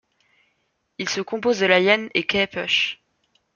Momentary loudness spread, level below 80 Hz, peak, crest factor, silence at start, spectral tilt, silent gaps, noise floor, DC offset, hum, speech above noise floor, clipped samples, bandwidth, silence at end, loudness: 10 LU; -62 dBFS; -2 dBFS; 22 dB; 1 s; -3.5 dB/octave; none; -71 dBFS; under 0.1%; none; 50 dB; under 0.1%; 7.2 kHz; 0.6 s; -20 LUFS